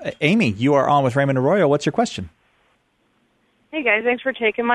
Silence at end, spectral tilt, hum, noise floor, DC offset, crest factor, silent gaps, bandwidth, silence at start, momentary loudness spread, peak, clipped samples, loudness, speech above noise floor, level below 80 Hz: 0 s; -6 dB/octave; none; -64 dBFS; under 0.1%; 18 dB; none; 11.5 kHz; 0 s; 8 LU; -2 dBFS; under 0.1%; -18 LUFS; 46 dB; -56 dBFS